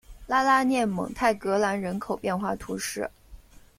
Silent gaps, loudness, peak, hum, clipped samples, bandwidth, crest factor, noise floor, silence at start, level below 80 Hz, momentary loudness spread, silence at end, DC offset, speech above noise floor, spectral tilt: none; -26 LUFS; -8 dBFS; none; under 0.1%; 16 kHz; 18 dB; -49 dBFS; 0.1 s; -52 dBFS; 10 LU; 0.4 s; under 0.1%; 23 dB; -4.5 dB/octave